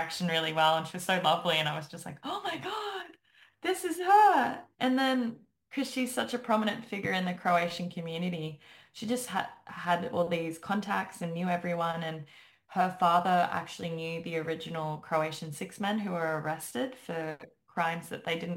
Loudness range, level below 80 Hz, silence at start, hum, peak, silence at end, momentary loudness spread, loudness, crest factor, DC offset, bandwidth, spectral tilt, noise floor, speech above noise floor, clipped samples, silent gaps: 6 LU; -74 dBFS; 0 s; none; -12 dBFS; 0 s; 13 LU; -31 LUFS; 20 dB; under 0.1%; 16.5 kHz; -4.5 dB/octave; -62 dBFS; 31 dB; under 0.1%; none